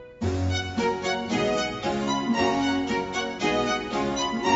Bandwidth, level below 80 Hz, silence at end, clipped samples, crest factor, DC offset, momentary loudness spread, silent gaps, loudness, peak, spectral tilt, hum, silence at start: 8 kHz; -48 dBFS; 0 s; under 0.1%; 16 dB; under 0.1%; 4 LU; none; -26 LUFS; -10 dBFS; -4.5 dB/octave; none; 0 s